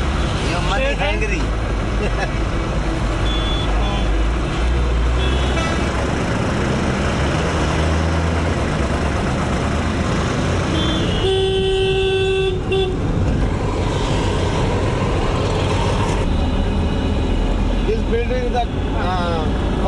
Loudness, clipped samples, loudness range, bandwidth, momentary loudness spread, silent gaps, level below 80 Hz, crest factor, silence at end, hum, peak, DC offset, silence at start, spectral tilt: -19 LUFS; under 0.1%; 2 LU; 11.5 kHz; 3 LU; none; -22 dBFS; 12 dB; 0 s; none; -6 dBFS; under 0.1%; 0 s; -6 dB/octave